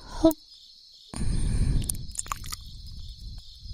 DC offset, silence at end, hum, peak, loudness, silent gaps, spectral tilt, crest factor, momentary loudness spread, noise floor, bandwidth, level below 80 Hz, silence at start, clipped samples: under 0.1%; 0 s; none; -6 dBFS; -30 LUFS; none; -5.5 dB/octave; 24 dB; 22 LU; -51 dBFS; 16 kHz; -34 dBFS; 0 s; under 0.1%